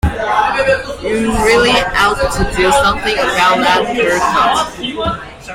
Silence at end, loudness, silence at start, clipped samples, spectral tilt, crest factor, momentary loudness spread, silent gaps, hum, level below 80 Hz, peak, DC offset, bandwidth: 0 s; -13 LUFS; 0.05 s; under 0.1%; -4 dB/octave; 12 dB; 8 LU; none; none; -28 dBFS; 0 dBFS; under 0.1%; 16.5 kHz